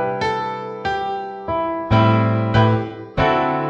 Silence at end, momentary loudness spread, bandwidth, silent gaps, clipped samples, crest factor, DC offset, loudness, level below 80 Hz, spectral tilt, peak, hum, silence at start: 0 s; 10 LU; 6.8 kHz; none; under 0.1%; 16 dB; under 0.1%; -19 LUFS; -40 dBFS; -8 dB/octave; -4 dBFS; none; 0 s